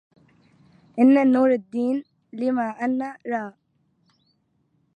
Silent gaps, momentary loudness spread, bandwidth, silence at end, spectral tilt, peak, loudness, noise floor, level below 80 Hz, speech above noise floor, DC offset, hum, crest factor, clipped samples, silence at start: none; 14 LU; 5 kHz; 1.45 s; -7.5 dB/octave; -6 dBFS; -22 LUFS; -68 dBFS; -78 dBFS; 47 dB; under 0.1%; none; 18 dB; under 0.1%; 0.95 s